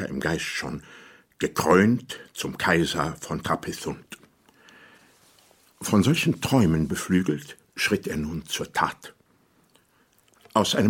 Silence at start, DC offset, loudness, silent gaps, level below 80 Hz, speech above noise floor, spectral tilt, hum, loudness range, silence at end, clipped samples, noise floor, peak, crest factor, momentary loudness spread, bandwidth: 0 s; under 0.1%; -25 LUFS; none; -50 dBFS; 39 dB; -5 dB/octave; none; 5 LU; 0 s; under 0.1%; -63 dBFS; -4 dBFS; 22 dB; 15 LU; 17 kHz